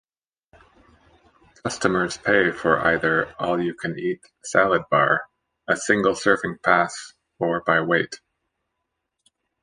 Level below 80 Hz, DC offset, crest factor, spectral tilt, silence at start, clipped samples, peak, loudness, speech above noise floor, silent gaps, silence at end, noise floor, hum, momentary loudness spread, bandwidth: -56 dBFS; under 0.1%; 22 dB; -4.5 dB/octave; 1.65 s; under 0.1%; -2 dBFS; -21 LUFS; 58 dB; none; 1.45 s; -79 dBFS; none; 12 LU; 10.5 kHz